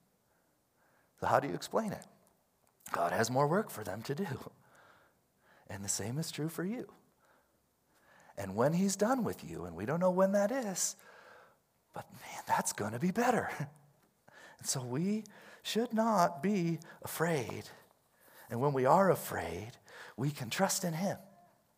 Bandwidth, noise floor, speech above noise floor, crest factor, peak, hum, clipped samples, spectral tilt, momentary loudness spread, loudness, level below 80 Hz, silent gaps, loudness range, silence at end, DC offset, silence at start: 16 kHz; -74 dBFS; 41 dB; 24 dB; -12 dBFS; none; under 0.1%; -5 dB/octave; 17 LU; -34 LUFS; -76 dBFS; none; 7 LU; 0.5 s; under 0.1%; 1.2 s